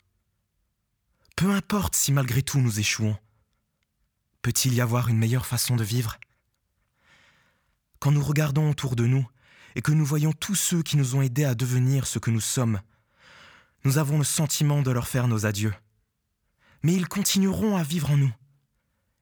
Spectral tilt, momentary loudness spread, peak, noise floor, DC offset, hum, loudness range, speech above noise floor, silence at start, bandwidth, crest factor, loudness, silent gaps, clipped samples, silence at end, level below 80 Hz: -5 dB/octave; 7 LU; -10 dBFS; -76 dBFS; under 0.1%; none; 3 LU; 52 dB; 1.35 s; over 20 kHz; 16 dB; -24 LUFS; none; under 0.1%; 0.9 s; -54 dBFS